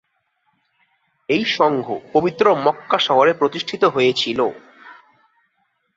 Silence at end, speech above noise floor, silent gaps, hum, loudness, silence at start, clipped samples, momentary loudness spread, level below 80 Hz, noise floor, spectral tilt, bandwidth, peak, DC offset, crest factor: 1.05 s; 50 dB; none; none; -18 LUFS; 1.3 s; under 0.1%; 7 LU; -62 dBFS; -68 dBFS; -5 dB/octave; 7.8 kHz; -2 dBFS; under 0.1%; 18 dB